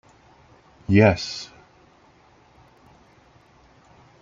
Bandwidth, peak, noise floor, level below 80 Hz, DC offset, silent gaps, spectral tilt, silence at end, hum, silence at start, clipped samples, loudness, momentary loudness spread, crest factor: 7.6 kHz; -2 dBFS; -55 dBFS; -56 dBFS; under 0.1%; none; -6.5 dB/octave; 2.75 s; none; 0.9 s; under 0.1%; -20 LUFS; 23 LU; 24 dB